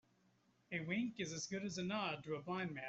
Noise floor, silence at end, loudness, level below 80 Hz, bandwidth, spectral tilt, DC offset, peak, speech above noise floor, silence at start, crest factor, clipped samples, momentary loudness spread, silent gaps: -76 dBFS; 0 s; -43 LUFS; -78 dBFS; 8.2 kHz; -4.5 dB/octave; under 0.1%; -28 dBFS; 33 dB; 0.7 s; 18 dB; under 0.1%; 5 LU; none